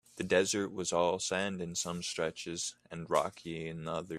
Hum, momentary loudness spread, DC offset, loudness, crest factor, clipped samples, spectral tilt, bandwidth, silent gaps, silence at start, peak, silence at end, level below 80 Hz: none; 9 LU; under 0.1%; -34 LUFS; 22 dB; under 0.1%; -3.5 dB/octave; 14.5 kHz; none; 0.15 s; -14 dBFS; 0 s; -68 dBFS